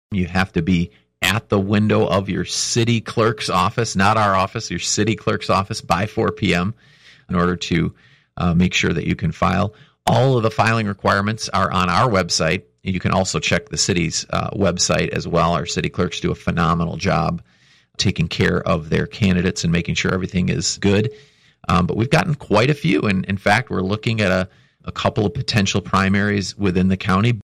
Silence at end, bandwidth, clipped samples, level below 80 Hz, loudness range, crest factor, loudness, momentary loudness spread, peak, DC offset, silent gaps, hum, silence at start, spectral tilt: 0 s; 14.5 kHz; under 0.1%; -42 dBFS; 2 LU; 14 dB; -19 LUFS; 6 LU; -4 dBFS; under 0.1%; none; none; 0.1 s; -5 dB/octave